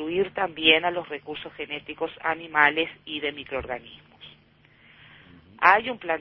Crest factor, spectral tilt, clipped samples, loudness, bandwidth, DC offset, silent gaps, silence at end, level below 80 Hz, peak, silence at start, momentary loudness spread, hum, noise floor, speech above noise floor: 26 dB; -5.5 dB/octave; under 0.1%; -24 LUFS; 6 kHz; under 0.1%; none; 0 s; -58 dBFS; -2 dBFS; 0 s; 16 LU; none; -58 dBFS; 32 dB